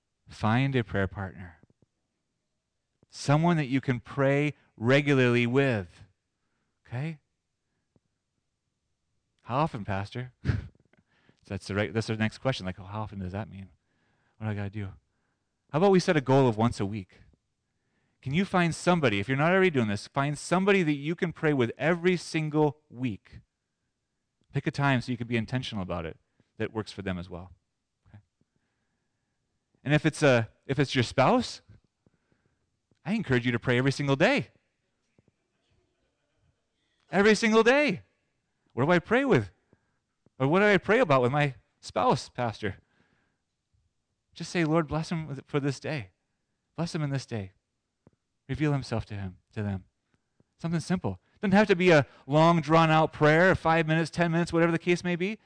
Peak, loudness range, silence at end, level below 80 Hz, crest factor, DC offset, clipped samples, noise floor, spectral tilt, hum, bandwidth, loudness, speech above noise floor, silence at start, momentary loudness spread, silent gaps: -14 dBFS; 10 LU; 0.1 s; -56 dBFS; 14 dB; under 0.1%; under 0.1%; -81 dBFS; -6.5 dB/octave; none; 10.5 kHz; -27 LUFS; 55 dB; 0.3 s; 16 LU; none